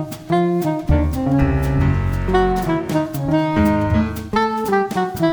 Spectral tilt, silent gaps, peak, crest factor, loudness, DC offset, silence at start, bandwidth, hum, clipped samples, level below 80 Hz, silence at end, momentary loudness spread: -7.5 dB/octave; none; -2 dBFS; 14 dB; -19 LUFS; under 0.1%; 0 s; over 20 kHz; none; under 0.1%; -28 dBFS; 0 s; 4 LU